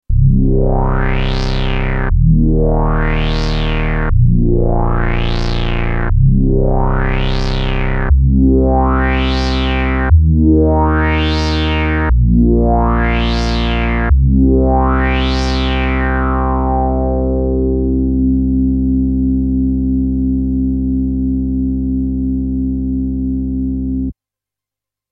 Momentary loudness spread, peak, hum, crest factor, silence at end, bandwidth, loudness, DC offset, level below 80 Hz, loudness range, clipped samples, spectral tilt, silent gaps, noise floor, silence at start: 6 LU; 0 dBFS; none; 12 dB; 1 s; 7 kHz; -15 LUFS; under 0.1%; -16 dBFS; 4 LU; under 0.1%; -8 dB/octave; none; -86 dBFS; 0.1 s